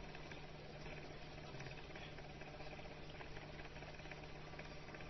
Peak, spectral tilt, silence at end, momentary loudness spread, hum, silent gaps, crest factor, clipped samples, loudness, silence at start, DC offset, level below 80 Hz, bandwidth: -36 dBFS; -4 dB/octave; 0 s; 2 LU; none; none; 16 dB; under 0.1%; -53 LUFS; 0 s; under 0.1%; -60 dBFS; 6 kHz